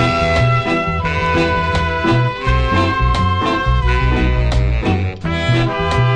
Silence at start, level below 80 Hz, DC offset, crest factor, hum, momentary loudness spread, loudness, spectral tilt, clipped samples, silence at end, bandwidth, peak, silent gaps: 0 s; -22 dBFS; 0.3%; 14 dB; none; 3 LU; -16 LUFS; -6.5 dB/octave; under 0.1%; 0 s; 9.6 kHz; -2 dBFS; none